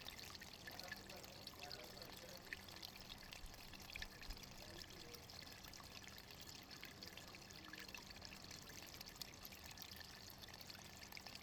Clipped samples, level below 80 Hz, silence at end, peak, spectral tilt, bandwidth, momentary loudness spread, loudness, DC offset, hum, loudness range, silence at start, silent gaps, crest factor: under 0.1%; -66 dBFS; 0 s; -30 dBFS; -2.5 dB/octave; over 20 kHz; 3 LU; -54 LUFS; under 0.1%; none; 1 LU; 0 s; none; 26 dB